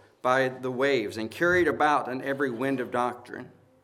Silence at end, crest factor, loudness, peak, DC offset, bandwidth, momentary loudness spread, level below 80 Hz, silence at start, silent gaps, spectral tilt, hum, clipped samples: 0.35 s; 18 dB; -26 LUFS; -8 dBFS; under 0.1%; 15 kHz; 10 LU; -62 dBFS; 0.25 s; none; -5.5 dB/octave; none; under 0.1%